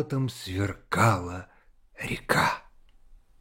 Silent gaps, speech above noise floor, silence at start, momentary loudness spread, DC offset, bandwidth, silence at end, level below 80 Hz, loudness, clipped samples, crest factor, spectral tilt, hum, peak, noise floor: none; 27 dB; 0 s; 14 LU; under 0.1%; 16.5 kHz; 0.25 s; -52 dBFS; -28 LUFS; under 0.1%; 22 dB; -5 dB/octave; none; -8 dBFS; -54 dBFS